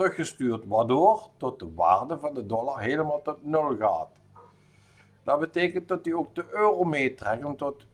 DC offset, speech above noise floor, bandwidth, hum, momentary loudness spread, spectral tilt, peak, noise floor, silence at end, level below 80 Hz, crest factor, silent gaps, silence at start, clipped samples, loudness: under 0.1%; 32 dB; 12 kHz; none; 10 LU; -6 dB/octave; -8 dBFS; -59 dBFS; 0.2 s; -66 dBFS; 20 dB; none; 0 s; under 0.1%; -27 LUFS